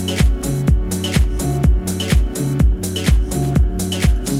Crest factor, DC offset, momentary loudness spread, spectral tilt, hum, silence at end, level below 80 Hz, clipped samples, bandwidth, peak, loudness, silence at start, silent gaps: 12 dB; under 0.1%; 2 LU; -5.5 dB/octave; none; 0 s; -18 dBFS; under 0.1%; 16 kHz; -2 dBFS; -18 LUFS; 0 s; none